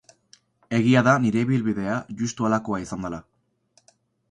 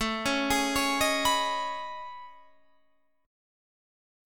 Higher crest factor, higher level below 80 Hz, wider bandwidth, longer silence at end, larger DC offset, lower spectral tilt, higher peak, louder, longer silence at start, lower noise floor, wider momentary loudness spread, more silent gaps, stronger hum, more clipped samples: about the same, 20 dB vs 18 dB; about the same, -56 dBFS vs -52 dBFS; second, 9.4 kHz vs 19 kHz; about the same, 1.1 s vs 1 s; second, under 0.1% vs 0.3%; first, -6.5 dB/octave vs -2 dB/octave; first, -4 dBFS vs -12 dBFS; first, -23 LUFS vs -27 LUFS; first, 0.7 s vs 0 s; second, -64 dBFS vs -71 dBFS; about the same, 14 LU vs 16 LU; neither; neither; neither